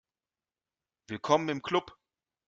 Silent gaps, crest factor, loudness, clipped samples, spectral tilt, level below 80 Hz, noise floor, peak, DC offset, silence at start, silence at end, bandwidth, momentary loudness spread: none; 24 dB; -30 LUFS; under 0.1%; -5 dB/octave; -72 dBFS; under -90 dBFS; -10 dBFS; under 0.1%; 1.1 s; 0.55 s; 7.8 kHz; 12 LU